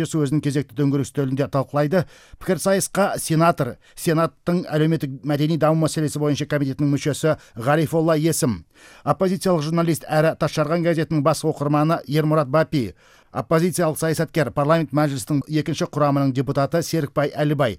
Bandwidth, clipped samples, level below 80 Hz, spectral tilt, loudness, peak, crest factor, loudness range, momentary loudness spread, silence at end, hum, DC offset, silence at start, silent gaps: 16 kHz; under 0.1%; -52 dBFS; -6 dB/octave; -21 LUFS; -4 dBFS; 16 dB; 1 LU; 6 LU; 0 s; none; under 0.1%; 0 s; none